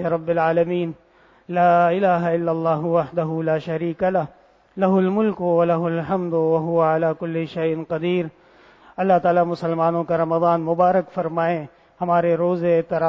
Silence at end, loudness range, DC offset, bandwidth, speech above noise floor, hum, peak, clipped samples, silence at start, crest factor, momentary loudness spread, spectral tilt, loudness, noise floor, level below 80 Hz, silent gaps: 0 s; 2 LU; under 0.1%; 6 kHz; 31 dB; none; -4 dBFS; under 0.1%; 0 s; 16 dB; 8 LU; -9.5 dB/octave; -20 LUFS; -50 dBFS; -62 dBFS; none